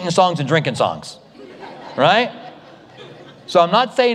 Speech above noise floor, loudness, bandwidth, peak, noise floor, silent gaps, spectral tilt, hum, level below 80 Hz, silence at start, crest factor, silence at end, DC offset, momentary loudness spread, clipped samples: 26 dB; -17 LUFS; 11.5 kHz; 0 dBFS; -42 dBFS; none; -5 dB/octave; none; -64 dBFS; 0 s; 18 dB; 0 s; under 0.1%; 23 LU; under 0.1%